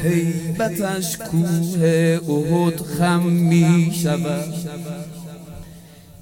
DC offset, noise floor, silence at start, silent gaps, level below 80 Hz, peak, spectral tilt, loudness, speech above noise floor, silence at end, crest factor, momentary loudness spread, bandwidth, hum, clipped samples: under 0.1%; -42 dBFS; 0 s; none; -50 dBFS; -4 dBFS; -6.5 dB/octave; -19 LUFS; 24 dB; 0.1 s; 14 dB; 17 LU; 17 kHz; none; under 0.1%